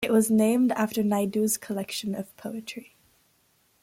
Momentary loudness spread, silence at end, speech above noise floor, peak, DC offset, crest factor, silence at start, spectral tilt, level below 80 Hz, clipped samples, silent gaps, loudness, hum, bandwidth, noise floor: 15 LU; 1 s; 41 dB; -12 dBFS; under 0.1%; 16 dB; 0 s; -4.5 dB/octave; -68 dBFS; under 0.1%; none; -26 LUFS; none; 16.5 kHz; -67 dBFS